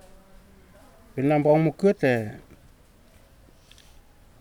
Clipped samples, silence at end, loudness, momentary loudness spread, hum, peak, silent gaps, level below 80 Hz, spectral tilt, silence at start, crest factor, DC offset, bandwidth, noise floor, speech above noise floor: under 0.1%; 2 s; -22 LUFS; 18 LU; none; -8 dBFS; none; -56 dBFS; -8 dB/octave; 1.15 s; 18 dB; under 0.1%; 17 kHz; -54 dBFS; 33 dB